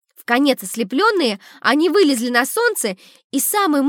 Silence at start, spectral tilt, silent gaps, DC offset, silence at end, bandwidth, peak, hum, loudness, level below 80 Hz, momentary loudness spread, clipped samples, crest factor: 0.3 s; -2.5 dB/octave; 3.24-3.30 s; under 0.1%; 0 s; 17.5 kHz; -2 dBFS; none; -17 LUFS; -82 dBFS; 8 LU; under 0.1%; 16 dB